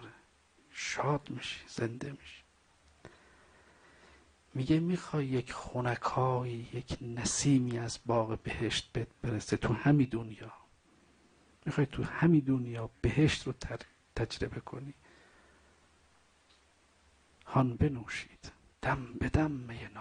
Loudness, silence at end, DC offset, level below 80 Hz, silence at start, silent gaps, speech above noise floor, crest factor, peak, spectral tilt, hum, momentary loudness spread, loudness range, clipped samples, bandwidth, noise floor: -33 LUFS; 0 s; under 0.1%; -52 dBFS; 0 s; none; 34 dB; 20 dB; -16 dBFS; -5.5 dB/octave; none; 17 LU; 11 LU; under 0.1%; 10 kHz; -67 dBFS